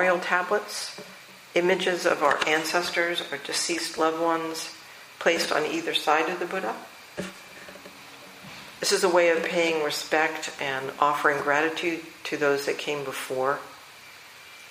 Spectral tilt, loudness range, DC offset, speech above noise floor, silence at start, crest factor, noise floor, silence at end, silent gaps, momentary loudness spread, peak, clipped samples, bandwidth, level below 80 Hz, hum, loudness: -2.5 dB/octave; 4 LU; under 0.1%; 22 dB; 0 s; 20 dB; -47 dBFS; 0 s; none; 21 LU; -6 dBFS; under 0.1%; 15.5 kHz; -72 dBFS; none; -25 LUFS